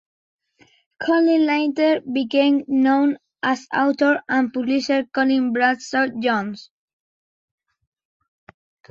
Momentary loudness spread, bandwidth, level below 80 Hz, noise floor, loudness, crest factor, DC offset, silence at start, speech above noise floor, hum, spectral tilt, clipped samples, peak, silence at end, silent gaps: 7 LU; 7.6 kHz; -68 dBFS; -58 dBFS; -20 LUFS; 16 dB; under 0.1%; 1 s; 39 dB; none; -4.5 dB/octave; under 0.1%; -6 dBFS; 2.3 s; none